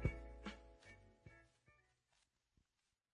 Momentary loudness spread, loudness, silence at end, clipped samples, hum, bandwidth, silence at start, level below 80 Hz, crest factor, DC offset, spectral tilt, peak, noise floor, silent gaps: 15 LU; -54 LUFS; 1.4 s; under 0.1%; none; 10 kHz; 0 s; -58 dBFS; 28 dB; under 0.1%; -7 dB/octave; -26 dBFS; -90 dBFS; none